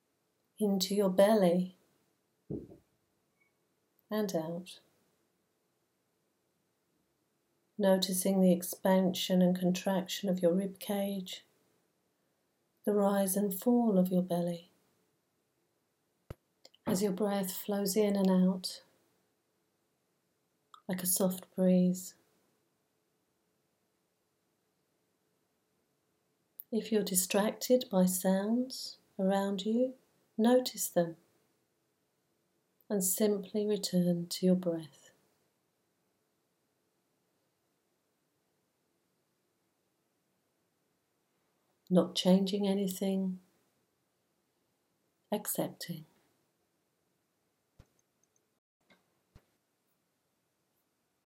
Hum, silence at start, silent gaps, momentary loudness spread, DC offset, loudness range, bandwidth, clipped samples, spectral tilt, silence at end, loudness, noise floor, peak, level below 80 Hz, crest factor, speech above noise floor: none; 0.6 s; none; 14 LU; under 0.1%; 11 LU; 16.5 kHz; under 0.1%; -5.5 dB/octave; 5.25 s; -31 LUFS; -80 dBFS; -12 dBFS; -78 dBFS; 22 dB; 49 dB